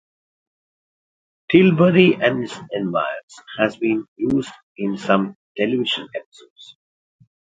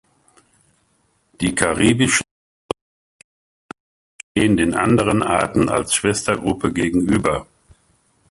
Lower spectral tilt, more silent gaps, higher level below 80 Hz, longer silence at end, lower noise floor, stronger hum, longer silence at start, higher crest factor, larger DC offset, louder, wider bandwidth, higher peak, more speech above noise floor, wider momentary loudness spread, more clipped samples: first, -7 dB/octave vs -4.5 dB/octave; second, 3.23-3.28 s, 4.08-4.16 s, 4.63-4.75 s, 5.35-5.55 s, 6.26-6.32 s, 6.50-6.56 s vs 2.31-2.69 s, 2.81-3.69 s, 3.80-4.35 s; second, -60 dBFS vs -42 dBFS; about the same, 0.9 s vs 0.9 s; first, under -90 dBFS vs -63 dBFS; neither; about the same, 1.5 s vs 1.4 s; about the same, 20 dB vs 20 dB; neither; about the same, -19 LUFS vs -18 LUFS; second, 7.8 kHz vs 11.5 kHz; about the same, 0 dBFS vs 0 dBFS; first, over 71 dB vs 46 dB; first, 16 LU vs 11 LU; neither